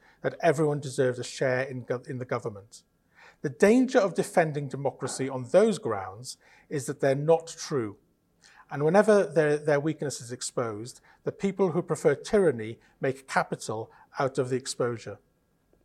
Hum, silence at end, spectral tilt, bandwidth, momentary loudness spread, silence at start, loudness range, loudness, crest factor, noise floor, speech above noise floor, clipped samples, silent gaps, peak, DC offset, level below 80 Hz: none; 0.7 s; -5.5 dB/octave; 13 kHz; 15 LU; 0.25 s; 4 LU; -27 LUFS; 20 dB; -68 dBFS; 41 dB; under 0.1%; none; -6 dBFS; under 0.1%; -66 dBFS